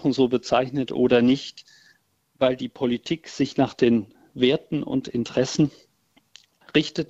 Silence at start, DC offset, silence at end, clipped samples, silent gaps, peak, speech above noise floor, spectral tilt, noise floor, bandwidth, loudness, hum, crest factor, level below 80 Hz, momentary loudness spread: 0 s; under 0.1%; 0.05 s; under 0.1%; none; -4 dBFS; 41 dB; -6 dB/octave; -64 dBFS; 8 kHz; -23 LUFS; none; 18 dB; -58 dBFS; 7 LU